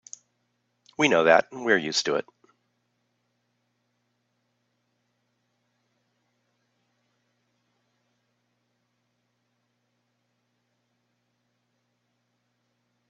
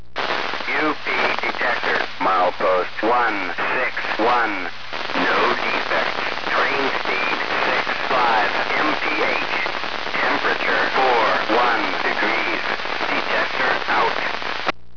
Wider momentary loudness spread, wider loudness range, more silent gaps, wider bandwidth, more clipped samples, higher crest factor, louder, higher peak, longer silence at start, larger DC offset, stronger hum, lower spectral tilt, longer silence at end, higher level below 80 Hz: first, 11 LU vs 5 LU; first, 9 LU vs 1 LU; neither; first, 8 kHz vs 5.4 kHz; neither; first, 28 dB vs 16 dB; second, -23 LUFS vs -20 LUFS; about the same, -4 dBFS vs -4 dBFS; first, 1 s vs 0.15 s; second, under 0.1% vs 3%; first, 60 Hz at -75 dBFS vs none; second, -1.5 dB/octave vs -3.5 dB/octave; first, 10.9 s vs 0.25 s; second, -76 dBFS vs -56 dBFS